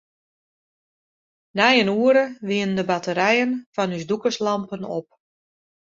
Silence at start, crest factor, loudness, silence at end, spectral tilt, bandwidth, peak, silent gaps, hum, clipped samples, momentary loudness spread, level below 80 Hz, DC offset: 1.55 s; 20 dB; -21 LUFS; 0.95 s; -5 dB/octave; 7.6 kHz; -2 dBFS; 3.66-3.73 s; none; under 0.1%; 13 LU; -68 dBFS; under 0.1%